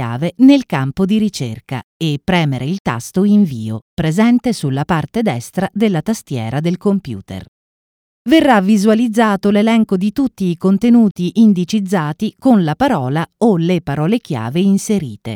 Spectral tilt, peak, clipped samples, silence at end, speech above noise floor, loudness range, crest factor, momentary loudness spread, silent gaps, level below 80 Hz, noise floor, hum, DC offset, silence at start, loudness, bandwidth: -6.5 dB/octave; 0 dBFS; under 0.1%; 0 s; over 76 dB; 4 LU; 14 dB; 10 LU; 1.84-2.00 s, 2.80-2.85 s, 3.82-3.97 s, 7.48-8.25 s, 11.11-11.15 s; -46 dBFS; under -90 dBFS; none; under 0.1%; 0 s; -15 LUFS; 16 kHz